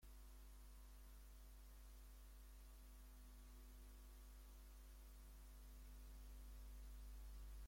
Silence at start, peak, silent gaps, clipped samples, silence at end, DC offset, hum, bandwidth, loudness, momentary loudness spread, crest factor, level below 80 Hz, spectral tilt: 0 s; -50 dBFS; none; under 0.1%; 0 s; under 0.1%; none; 16.5 kHz; -63 LUFS; 4 LU; 10 dB; -60 dBFS; -4.5 dB/octave